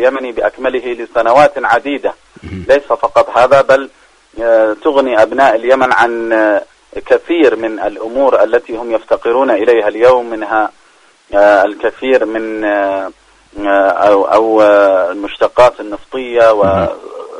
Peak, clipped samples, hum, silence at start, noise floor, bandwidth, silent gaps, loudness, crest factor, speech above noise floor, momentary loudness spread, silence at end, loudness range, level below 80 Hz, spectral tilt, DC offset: 0 dBFS; 0.3%; none; 0 s; -47 dBFS; 10.5 kHz; none; -11 LUFS; 12 dB; 36 dB; 10 LU; 0 s; 3 LU; -44 dBFS; -5.5 dB/octave; under 0.1%